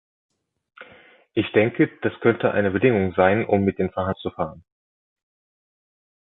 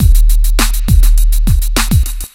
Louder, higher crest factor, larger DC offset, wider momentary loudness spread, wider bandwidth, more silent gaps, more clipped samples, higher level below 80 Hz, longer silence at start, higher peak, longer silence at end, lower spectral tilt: second, -22 LUFS vs -13 LUFS; first, 20 dB vs 8 dB; neither; first, 10 LU vs 3 LU; second, 4 kHz vs 16.5 kHz; neither; second, under 0.1% vs 0.4%; second, -50 dBFS vs -8 dBFS; first, 0.8 s vs 0 s; second, -4 dBFS vs 0 dBFS; first, 1.6 s vs 0.1 s; first, -10.5 dB/octave vs -4 dB/octave